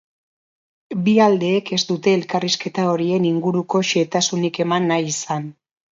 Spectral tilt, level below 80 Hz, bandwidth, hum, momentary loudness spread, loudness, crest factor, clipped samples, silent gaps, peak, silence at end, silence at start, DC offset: -4.5 dB/octave; -66 dBFS; 7.8 kHz; none; 8 LU; -19 LUFS; 18 dB; under 0.1%; none; -2 dBFS; 0.4 s; 0.9 s; under 0.1%